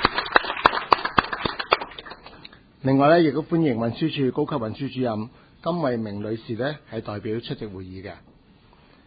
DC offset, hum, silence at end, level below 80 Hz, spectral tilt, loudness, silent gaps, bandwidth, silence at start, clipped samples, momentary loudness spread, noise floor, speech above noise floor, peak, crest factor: under 0.1%; none; 0.9 s; -52 dBFS; -8 dB/octave; -23 LUFS; none; 8 kHz; 0 s; under 0.1%; 18 LU; -54 dBFS; 30 dB; 0 dBFS; 24 dB